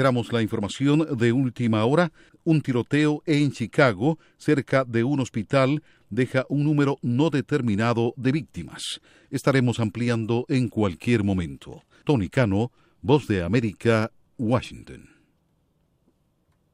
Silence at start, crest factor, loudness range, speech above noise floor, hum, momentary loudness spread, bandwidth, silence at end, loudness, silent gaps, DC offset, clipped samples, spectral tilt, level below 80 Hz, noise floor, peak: 0 s; 18 dB; 3 LU; 44 dB; none; 10 LU; 13.5 kHz; 1.75 s; -24 LUFS; none; under 0.1%; under 0.1%; -7 dB/octave; -54 dBFS; -67 dBFS; -6 dBFS